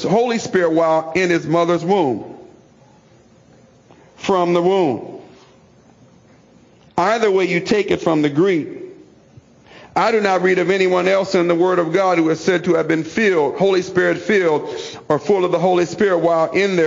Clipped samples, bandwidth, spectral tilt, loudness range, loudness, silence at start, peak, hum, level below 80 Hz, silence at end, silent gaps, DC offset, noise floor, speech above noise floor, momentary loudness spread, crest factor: under 0.1%; 7.6 kHz; -5.5 dB/octave; 6 LU; -17 LUFS; 0 s; -4 dBFS; none; -58 dBFS; 0 s; none; under 0.1%; -49 dBFS; 33 dB; 6 LU; 14 dB